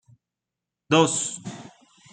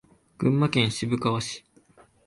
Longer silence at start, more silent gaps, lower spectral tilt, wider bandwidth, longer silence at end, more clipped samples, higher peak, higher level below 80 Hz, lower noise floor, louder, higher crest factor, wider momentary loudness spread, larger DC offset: first, 0.9 s vs 0.4 s; neither; second, -3.5 dB/octave vs -5.5 dB/octave; second, 9.6 kHz vs 11.5 kHz; second, 0.45 s vs 0.65 s; neither; first, -4 dBFS vs -8 dBFS; second, -70 dBFS vs -58 dBFS; first, -87 dBFS vs -57 dBFS; first, -22 LUFS vs -25 LUFS; about the same, 24 dB vs 20 dB; first, 20 LU vs 11 LU; neither